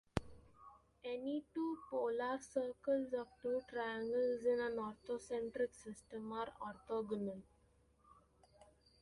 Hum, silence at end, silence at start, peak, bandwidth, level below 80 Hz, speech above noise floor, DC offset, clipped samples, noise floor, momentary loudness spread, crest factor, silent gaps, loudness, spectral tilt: none; 0.4 s; 0.15 s; -18 dBFS; 11.5 kHz; -68 dBFS; 32 dB; under 0.1%; under 0.1%; -73 dBFS; 13 LU; 24 dB; none; -42 LUFS; -6 dB/octave